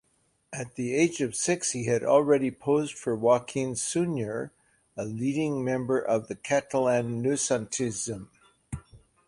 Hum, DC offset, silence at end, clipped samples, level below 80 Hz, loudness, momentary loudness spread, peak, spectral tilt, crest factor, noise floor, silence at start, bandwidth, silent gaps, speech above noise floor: none; under 0.1%; 0.3 s; under 0.1%; -60 dBFS; -27 LUFS; 14 LU; -8 dBFS; -5 dB/octave; 20 dB; -70 dBFS; 0.5 s; 11.5 kHz; none; 43 dB